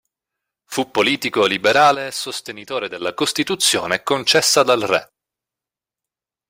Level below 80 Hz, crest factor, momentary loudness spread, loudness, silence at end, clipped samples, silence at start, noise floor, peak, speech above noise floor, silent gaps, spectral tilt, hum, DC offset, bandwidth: -62 dBFS; 18 dB; 12 LU; -17 LUFS; 1.45 s; under 0.1%; 0.7 s; -88 dBFS; -2 dBFS; 70 dB; none; -2 dB/octave; none; under 0.1%; 16 kHz